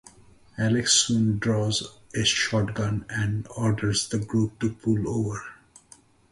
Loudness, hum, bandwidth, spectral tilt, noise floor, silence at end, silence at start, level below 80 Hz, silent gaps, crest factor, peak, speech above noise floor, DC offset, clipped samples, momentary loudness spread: -25 LUFS; none; 11.5 kHz; -4 dB/octave; -55 dBFS; 0.8 s; 0.55 s; -50 dBFS; none; 22 dB; -4 dBFS; 31 dB; under 0.1%; under 0.1%; 10 LU